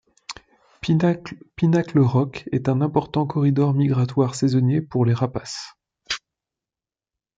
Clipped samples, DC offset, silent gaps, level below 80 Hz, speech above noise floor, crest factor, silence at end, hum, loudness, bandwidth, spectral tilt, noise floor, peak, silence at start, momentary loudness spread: under 0.1%; under 0.1%; none; -56 dBFS; over 70 dB; 16 dB; 1.2 s; none; -21 LUFS; 9.2 kHz; -7 dB/octave; under -90 dBFS; -4 dBFS; 0.3 s; 15 LU